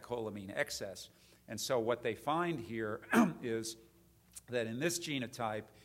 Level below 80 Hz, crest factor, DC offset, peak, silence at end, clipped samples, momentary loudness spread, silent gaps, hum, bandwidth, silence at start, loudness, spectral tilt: -70 dBFS; 22 dB; under 0.1%; -16 dBFS; 0.05 s; under 0.1%; 15 LU; none; none; 16 kHz; 0 s; -37 LUFS; -4.5 dB/octave